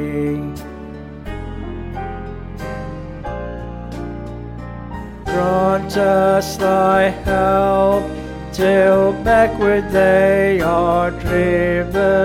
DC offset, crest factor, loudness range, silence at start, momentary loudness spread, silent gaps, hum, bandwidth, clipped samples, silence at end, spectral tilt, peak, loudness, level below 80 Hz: under 0.1%; 14 dB; 14 LU; 0 s; 17 LU; none; none; 16 kHz; under 0.1%; 0 s; -6.5 dB/octave; -2 dBFS; -16 LUFS; -34 dBFS